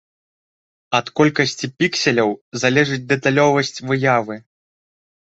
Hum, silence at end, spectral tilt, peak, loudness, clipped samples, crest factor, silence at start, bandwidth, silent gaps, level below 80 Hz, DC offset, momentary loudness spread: none; 1 s; -4.5 dB/octave; -2 dBFS; -18 LUFS; under 0.1%; 18 dB; 0.9 s; 8.2 kHz; 2.41-2.52 s; -60 dBFS; under 0.1%; 6 LU